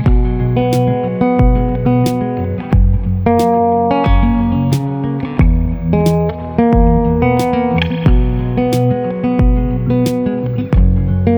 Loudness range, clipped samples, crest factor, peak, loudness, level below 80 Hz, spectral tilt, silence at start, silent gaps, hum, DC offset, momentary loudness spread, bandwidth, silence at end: 1 LU; under 0.1%; 12 dB; 0 dBFS; -14 LUFS; -18 dBFS; -8.5 dB/octave; 0 s; none; none; under 0.1%; 4 LU; over 20 kHz; 0 s